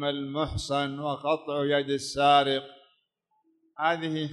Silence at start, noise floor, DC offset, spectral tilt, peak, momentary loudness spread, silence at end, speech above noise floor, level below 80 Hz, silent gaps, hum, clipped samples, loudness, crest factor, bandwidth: 0 s; -74 dBFS; under 0.1%; -4.5 dB/octave; -8 dBFS; 9 LU; 0 s; 47 dB; -52 dBFS; none; none; under 0.1%; -27 LUFS; 20 dB; 12 kHz